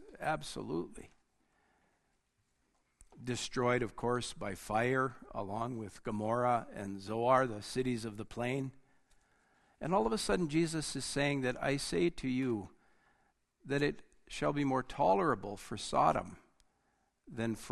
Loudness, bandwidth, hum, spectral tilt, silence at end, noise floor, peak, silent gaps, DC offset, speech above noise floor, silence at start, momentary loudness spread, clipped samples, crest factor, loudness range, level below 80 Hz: -35 LUFS; 12.5 kHz; none; -5 dB/octave; 0 s; -78 dBFS; -14 dBFS; none; under 0.1%; 44 dB; 0 s; 13 LU; under 0.1%; 22 dB; 5 LU; -58 dBFS